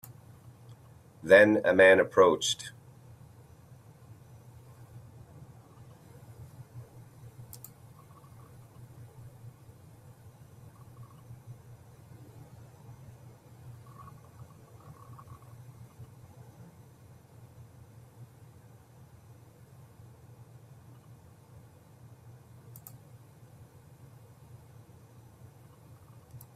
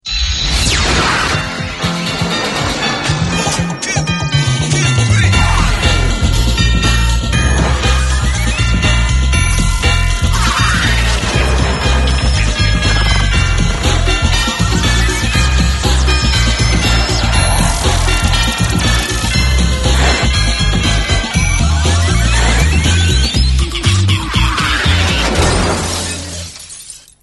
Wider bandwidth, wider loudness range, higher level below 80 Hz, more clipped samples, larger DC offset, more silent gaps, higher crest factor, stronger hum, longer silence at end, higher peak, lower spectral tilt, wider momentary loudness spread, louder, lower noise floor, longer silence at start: first, 15.5 kHz vs 12 kHz; first, 30 LU vs 2 LU; second, -68 dBFS vs -16 dBFS; neither; neither; neither; first, 26 dB vs 12 dB; neither; about the same, 0.2 s vs 0.25 s; second, -8 dBFS vs 0 dBFS; about the same, -4.5 dB/octave vs -4 dB/octave; first, 31 LU vs 4 LU; second, -22 LUFS vs -13 LUFS; first, -55 dBFS vs -33 dBFS; first, 1.25 s vs 0.05 s